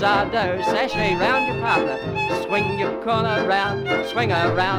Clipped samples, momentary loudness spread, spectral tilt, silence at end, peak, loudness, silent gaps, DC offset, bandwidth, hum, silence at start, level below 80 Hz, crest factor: under 0.1%; 4 LU; -5.5 dB/octave; 0 s; -6 dBFS; -21 LUFS; none; under 0.1%; over 20 kHz; none; 0 s; -46 dBFS; 16 dB